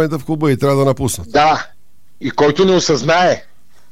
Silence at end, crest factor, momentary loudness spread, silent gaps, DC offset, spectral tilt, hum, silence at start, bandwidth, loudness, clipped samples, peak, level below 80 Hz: 0.5 s; 14 dB; 10 LU; none; 2%; -5 dB/octave; none; 0 s; 16 kHz; -14 LUFS; under 0.1%; -2 dBFS; -44 dBFS